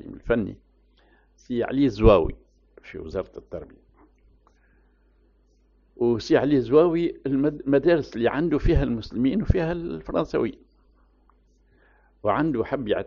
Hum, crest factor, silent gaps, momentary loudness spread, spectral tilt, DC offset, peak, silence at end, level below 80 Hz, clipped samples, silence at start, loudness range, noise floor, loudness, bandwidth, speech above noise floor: none; 22 dB; none; 14 LU; -6.5 dB/octave; under 0.1%; -2 dBFS; 0 s; -36 dBFS; under 0.1%; 0.05 s; 11 LU; -61 dBFS; -23 LUFS; 7.2 kHz; 38 dB